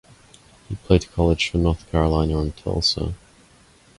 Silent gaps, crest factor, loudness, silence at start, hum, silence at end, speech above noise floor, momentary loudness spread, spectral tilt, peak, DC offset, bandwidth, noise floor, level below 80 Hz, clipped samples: none; 20 dB; -21 LUFS; 0.7 s; none; 0.8 s; 32 dB; 12 LU; -6 dB/octave; -4 dBFS; under 0.1%; 11.5 kHz; -53 dBFS; -30 dBFS; under 0.1%